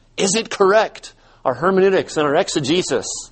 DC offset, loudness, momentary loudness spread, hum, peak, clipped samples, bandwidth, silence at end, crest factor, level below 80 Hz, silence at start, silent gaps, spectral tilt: under 0.1%; -18 LUFS; 9 LU; none; -2 dBFS; under 0.1%; 8.8 kHz; 0.05 s; 16 dB; -52 dBFS; 0.15 s; none; -3.5 dB/octave